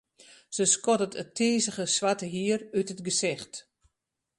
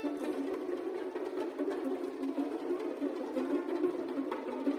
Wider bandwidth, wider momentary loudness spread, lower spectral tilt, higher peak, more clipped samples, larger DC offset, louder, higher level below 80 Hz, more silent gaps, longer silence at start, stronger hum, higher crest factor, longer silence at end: second, 11.5 kHz vs 14 kHz; first, 12 LU vs 4 LU; second, -3 dB/octave vs -5.5 dB/octave; first, -10 dBFS vs -20 dBFS; neither; neither; first, -27 LUFS vs -36 LUFS; first, -72 dBFS vs -78 dBFS; neither; first, 0.5 s vs 0 s; neither; first, 20 dB vs 14 dB; first, 0.75 s vs 0 s